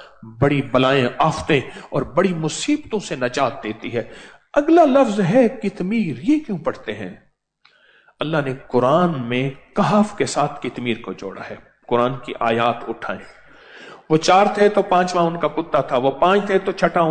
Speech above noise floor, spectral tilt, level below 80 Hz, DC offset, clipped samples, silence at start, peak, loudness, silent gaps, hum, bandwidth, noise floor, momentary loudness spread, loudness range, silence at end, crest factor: 40 dB; -6 dB/octave; -50 dBFS; under 0.1%; under 0.1%; 0 s; -4 dBFS; -19 LUFS; none; none; 9.4 kHz; -59 dBFS; 13 LU; 5 LU; 0 s; 16 dB